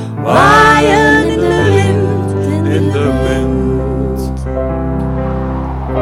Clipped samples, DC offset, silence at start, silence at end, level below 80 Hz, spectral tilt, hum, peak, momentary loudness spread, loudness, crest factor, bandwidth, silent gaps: under 0.1%; under 0.1%; 0 s; 0 s; -24 dBFS; -6.5 dB/octave; none; 0 dBFS; 11 LU; -12 LUFS; 12 dB; 15 kHz; none